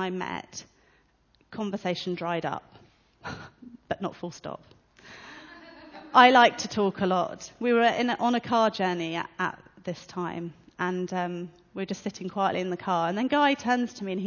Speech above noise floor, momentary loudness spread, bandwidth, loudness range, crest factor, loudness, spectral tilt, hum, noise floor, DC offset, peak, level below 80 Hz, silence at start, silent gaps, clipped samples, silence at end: 39 dB; 20 LU; 7.2 kHz; 13 LU; 24 dB; -26 LUFS; -5 dB/octave; none; -65 dBFS; under 0.1%; -4 dBFS; -64 dBFS; 0 s; none; under 0.1%; 0 s